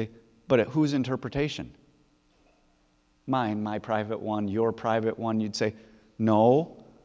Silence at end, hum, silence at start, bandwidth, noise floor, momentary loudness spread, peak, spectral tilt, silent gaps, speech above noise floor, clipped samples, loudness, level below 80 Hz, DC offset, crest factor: 0.2 s; none; 0 s; 8 kHz; -66 dBFS; 9 LU; -8 dBFS; -7 dB/octave; none; 40 dB; under 0.1%; -27 LUFS; -58 dBFS; under 0.1%; 20 dB